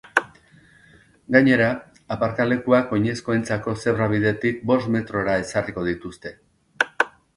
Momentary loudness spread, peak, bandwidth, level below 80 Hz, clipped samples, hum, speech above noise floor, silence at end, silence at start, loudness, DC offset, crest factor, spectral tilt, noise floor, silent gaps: 10 LU; 0 dBFS; 11.5 kHz; -52 dBFS; under 0.1%; none; 32 dB; 0.3 s; 0.15 s; -22 LUFS; under 0.1%; 22 dB; -6.5 dB/octave; -53 dBFS; none